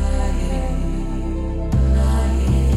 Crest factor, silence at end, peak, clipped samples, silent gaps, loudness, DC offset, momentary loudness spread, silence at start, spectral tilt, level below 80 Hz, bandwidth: 12 dB; 0 s; -6 dBFS; under 0.1%; none; -21 LUFS; under 0.1%; 8 LU; 0 s; -7.5 dB/octave; -18 dBFS; 11.5 kHz